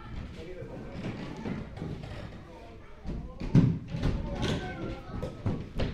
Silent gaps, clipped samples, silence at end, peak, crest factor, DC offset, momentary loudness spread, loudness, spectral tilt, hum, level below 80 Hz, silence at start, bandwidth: none; under 0.1%; 0 s; -10 dBFS; 24 dB; under 0.1%; 18 LU; -34 LUFS; -7.5 dB/octave; none; -42 dBFS; 0 s; 10.5 kHz